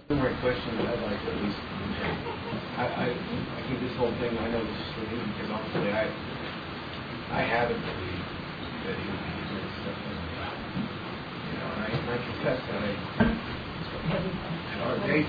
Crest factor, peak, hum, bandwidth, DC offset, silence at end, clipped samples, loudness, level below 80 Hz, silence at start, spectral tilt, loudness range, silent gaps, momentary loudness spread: 20 dB; -12 dBFS; none; 5 kHz; under 0.1%; 0 s; under 0.1%; -31 LUFS; -48 dBFS; 0 s; -8 dB/octave; 3 LU; none; 8 LU